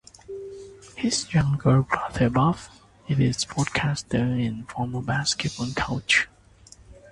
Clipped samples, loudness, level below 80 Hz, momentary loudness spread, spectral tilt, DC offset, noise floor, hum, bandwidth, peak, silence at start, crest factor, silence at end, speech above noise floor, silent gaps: under 0.1%; -24 LUFS; -46 dBFS; 17 LU; -5 dB/octave; under 0.1%; -52 dBFS; none; 11.5 kHz; -4 dBFS; 0.3 s; 22 dB; 0.2 s; 28 dB; none